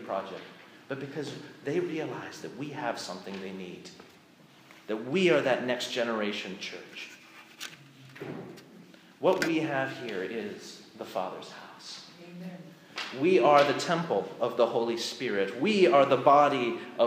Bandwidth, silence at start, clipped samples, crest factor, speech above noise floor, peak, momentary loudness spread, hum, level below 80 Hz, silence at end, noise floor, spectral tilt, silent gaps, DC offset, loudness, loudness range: 15.5 kHz; 0 s; under 0.1%; 22 dB; 28 dB; -8 dBFS; 22 LU; none; -82 dBFS; 0 s; -57 dBFS; -5 dB/octave; none; under 0.1%; -28 LUFS; 12 LU